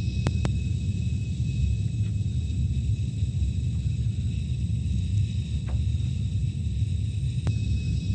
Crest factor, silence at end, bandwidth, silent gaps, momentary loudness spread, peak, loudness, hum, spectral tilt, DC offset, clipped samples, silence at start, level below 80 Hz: 20 dB; 0 s; 9 kHz; none; 2 LU; -6 dBFS; -28 LUFS; none; -7 dB/octave; under 0.1%; under 0.1%; 0 s; -32 dBFS